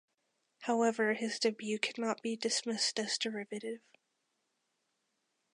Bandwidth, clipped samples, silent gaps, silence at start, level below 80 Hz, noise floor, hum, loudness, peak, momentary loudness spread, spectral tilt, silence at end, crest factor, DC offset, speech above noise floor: 11 kHz; under 0.1%; none; 0.6 s; under -90 dBFS; -82 dBFS; none; -34 LUFS; -14 dBFS; 11 LU; -2.5 dB/octave; 1.75 s; 24 dB; under 0.1%; 47 dB